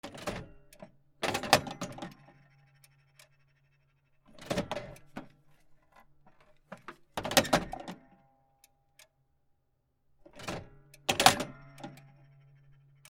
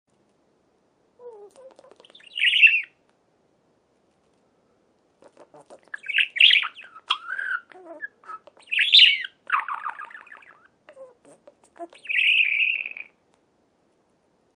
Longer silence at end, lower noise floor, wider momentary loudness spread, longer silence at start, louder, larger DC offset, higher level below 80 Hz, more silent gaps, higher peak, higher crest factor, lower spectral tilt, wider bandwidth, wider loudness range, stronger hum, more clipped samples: second, 1.15 s vs 1.55 s; first, -75 dBFS vs -66 dBFS; about the same, 27 LU vs 26 LU; second, 0.05 s vs 1.25 s; second, -31 LUFS vs -18 LUFS; neither; first, -60 dBFS vs -86 dBFS; neither; about the same, -2 dBFS vs -4 dBFS; first, 34 dB vs 22 dB; first, -2.5 dB/octave vs 2 dB/octave; first, 17 kHz vs 10.5 kHz; first, 11 LU vs 4 LU; neither; neither